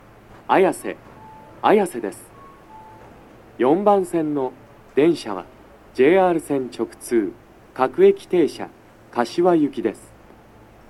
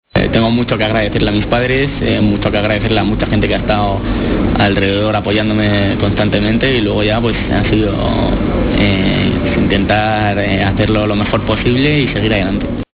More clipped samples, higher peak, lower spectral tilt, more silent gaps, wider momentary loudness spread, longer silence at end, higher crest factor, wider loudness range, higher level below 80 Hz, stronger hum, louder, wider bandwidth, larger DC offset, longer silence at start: neither; about the same, -2 dBFS vs 0 dBFS; second, -6 dB/octave vs -10.5 dB/octave; neither; first, 17 LU vs 3 LU; first, 0.95 s vs 0.1 s; first, 20 dB vs 12 dB; about the same, 3 LU vs 1 LU; second, -56 dBFS vs -24 dBFS; neither; second, -20 LUFS vs -13 LUFS; first, 12.5 kHz vs 4 kHz; neither; first, 0.5 s vs 0.15 s